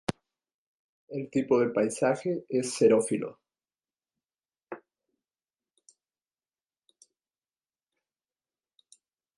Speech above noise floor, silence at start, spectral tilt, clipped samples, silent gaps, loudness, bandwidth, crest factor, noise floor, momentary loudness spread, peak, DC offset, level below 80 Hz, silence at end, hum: over 64 dB; 0.1 s; -5.5 dB/octave; under 0.1%; 0.54-1.08 s; -27 LUFS; 11.5 kHz; 22 dB; under -90 dBFS; 23 LU; -10 dBFS; under 0.1%; -70 dBFS; 4.6 s; none